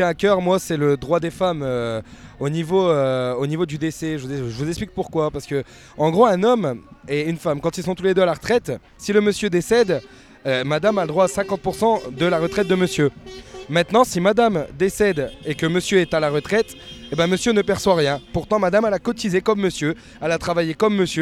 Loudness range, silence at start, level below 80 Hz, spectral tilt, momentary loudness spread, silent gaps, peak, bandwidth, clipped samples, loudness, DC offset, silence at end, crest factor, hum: 3 LU; 0 s; -46 dBFS; -5.5 dB/octave; 9 LU; none; -2 dBFS; 16 kHz; under 0.1%; -20 LUFS; under 0.1%; 0 s; 18 dB; none